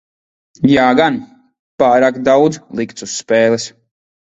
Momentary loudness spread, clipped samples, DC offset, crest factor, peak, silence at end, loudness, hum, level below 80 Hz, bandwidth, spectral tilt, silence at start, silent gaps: 12 LU; under 0.1%; under 0.1%; 14 dB; 0 dBFS; 0.55 s; -14 LUFS; none; -52 dBFS; 8.2 kHz; -5 dB/octave; 0.6 s; 1.59-1.78 s